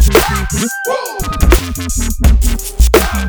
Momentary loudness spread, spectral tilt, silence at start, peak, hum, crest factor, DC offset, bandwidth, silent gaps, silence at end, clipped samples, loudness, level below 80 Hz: 7 LU; -4.5 dB/octave; 0 s; 0 dBFS; none; 12 dB; under 0.1%; over 20 kHz; none; 0 s; 0.4%; -14 LUFS; -14 dBFS